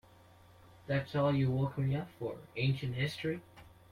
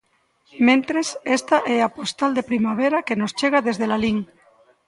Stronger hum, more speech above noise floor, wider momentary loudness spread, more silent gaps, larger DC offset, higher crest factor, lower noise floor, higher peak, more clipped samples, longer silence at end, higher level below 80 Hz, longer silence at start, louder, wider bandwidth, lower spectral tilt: neither; second, 26 dB vs 36 dB; first, 11 LU vs 7 LU; neither; neither; about the same, 16 dB vs 18 dB; first, -60 dBFS vs -56 dBFS; second, -20 dBFS vs -4 dBFS; neither; second, 0.25 s vs 0.65 s; about the same, -62 dBFS vs -58 dBFS; first, 0.85 s vs 0.55 s; second, -35 LUFS vs -21 LUFS; about the same, 12 kHz vs 11.5 kHz; first, -7.5 dB/octave vs -4.5 dB/octave